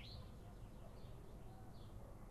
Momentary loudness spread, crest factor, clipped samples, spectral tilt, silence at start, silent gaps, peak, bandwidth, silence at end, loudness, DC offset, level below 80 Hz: 2 LU; 14 dB; under 0.1%; -6 dB/octave; 0 s; none; -42 dBFS; 13 kHz; 0 s; -58 LUFS; under 0.1%; -58 dBFS